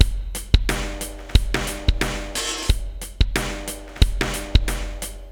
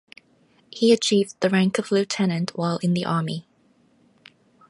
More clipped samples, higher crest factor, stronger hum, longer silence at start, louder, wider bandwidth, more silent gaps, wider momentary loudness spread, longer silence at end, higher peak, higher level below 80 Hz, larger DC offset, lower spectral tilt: neither; about the same, 22 dB vs 18 dB; neither; second, 0 s vs 0.75 s; about the same, -24 LUFS vs -22 LUFS; first, 19.5 kHz vs 11.5 kHz; neither; about the same, 10 LU vs 8 LU; second, 0 s vs 1.3 s; first, 0 dBFS vs -6 dBFS; first, -24 dBFS vs -70 dBFS; first, 0.1% vs under 0.1%; second, -4 dB/octave vs -5.5 dB/octave